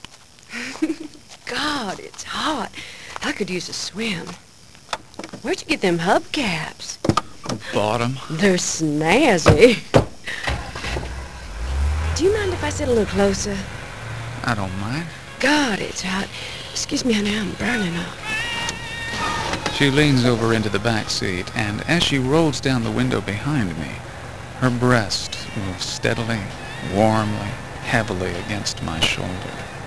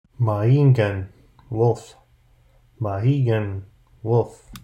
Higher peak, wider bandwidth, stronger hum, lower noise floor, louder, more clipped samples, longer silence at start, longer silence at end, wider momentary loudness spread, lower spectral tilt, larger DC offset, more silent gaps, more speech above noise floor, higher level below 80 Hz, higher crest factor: first, 0 dBFS vs -6 dBFS; first, 11 kHz vs 8.8 kHz; neither; second, -44 dBFS vs -56 dBFS; about the same, -21 LUFS vs -21 LUFS; neither; second, 0 s vs 0.2 s; about the same, 0 s vs 0.05 s; about the same, 13 LU vs 15 LU; second, -4.5 dB/octave vs -9 dB/octave; first, 0.9% vs under 0.1%; neither; second, 24 dB vs 36 dB; first, -36 dBFS vs -54 dBFS; first, 22 dB vs 16 dB